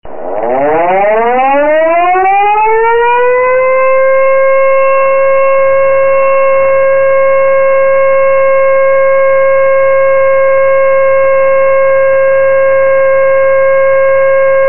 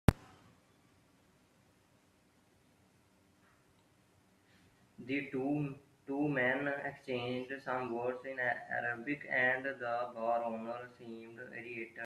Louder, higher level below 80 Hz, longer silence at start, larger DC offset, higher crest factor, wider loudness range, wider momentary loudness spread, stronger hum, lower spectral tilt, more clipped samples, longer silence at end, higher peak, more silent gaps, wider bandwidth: first, -8 LUFS vs -37 LUFS; first, -44 dBFS vs -54 dBFS; about the same, 0 s vs 0.1 s; first, 10% vs under 0.1%; second, 4 dB vs 34 dB; second, 0 LU vs 7 LU; second, 1 LU vs 15 LU; neither; second, 2.5 dB/octave vs -7 dB/octave; neither; about the same, 0 s vs 0 s; about the same, -4 dBFS vs -6 dBFS; neither; second, 3.1 kHz vs 14 kHz